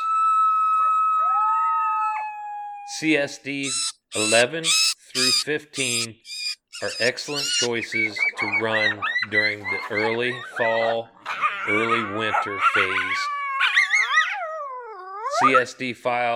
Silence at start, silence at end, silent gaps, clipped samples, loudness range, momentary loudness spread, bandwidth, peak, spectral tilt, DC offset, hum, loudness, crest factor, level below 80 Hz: 0 s; 0 s; none; under 0.1%; 2 LU; 11 LU; 19 kHz; -4 dBFS; -1.5 dB/octave; under 0.1%; none; -21 LUFS; 18 dB; -74 dBFS